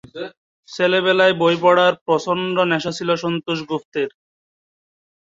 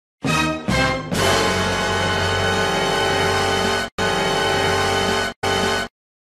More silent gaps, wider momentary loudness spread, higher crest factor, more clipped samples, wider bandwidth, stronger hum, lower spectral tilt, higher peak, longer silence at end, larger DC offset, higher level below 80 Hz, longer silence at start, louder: first, 0.37-0.63 s, 2.01-2.06 s, 3.85-3.92 s vs 3.92-3.98 s, 5.36-5.42 s; first, 14 LU vs 3 LU; about the same, 18 dB vs 16 dB; neither; second, 7.8 kHz vs 13 kHz; neither; first, -5 dB/octave vs -3.5 dB/octave; about the same, -2 dBFS vs -4 dBFS; first, 1.1 s vs 0.35 s; neither; second, -64 dBFS vs -40 dBFS; about the same, 0.15 s vs 0.25 s; about the same, -18 LUFS vs -19 LUFS